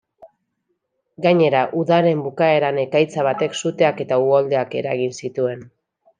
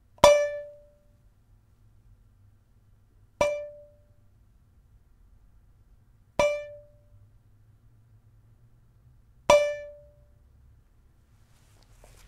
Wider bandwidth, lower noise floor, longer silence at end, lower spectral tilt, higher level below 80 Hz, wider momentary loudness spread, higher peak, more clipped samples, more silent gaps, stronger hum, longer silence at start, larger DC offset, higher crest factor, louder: second, 9.6 kHz vs 15 kHz; first, -73 dBFS vs -60 dBFS; second, 0.55 s vs 2.35 s; first, -6 dB/octave vs -3 dB/octave; second, -70 dBFS vs -54 dBFS; second, 7 LU vs 26 LU; about the same, -2 dBFS vs 0 dBFS; neither; neither; neither; about the same, 0.25 s vs 0.25 s; neither; second, 18 dB vs 32 dB; first, -19 LUFS vs -25 LUFS